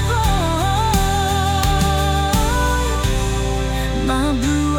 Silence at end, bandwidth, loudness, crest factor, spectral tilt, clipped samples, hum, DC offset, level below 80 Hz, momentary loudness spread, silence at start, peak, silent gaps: 0 s; 19 kHz; -18 LUFS; 14 dB; -5 dB/octave; under 0.1%; none; under 0.1%; -22 dBFS; 3 LU; 0 s; -4 dBFS; none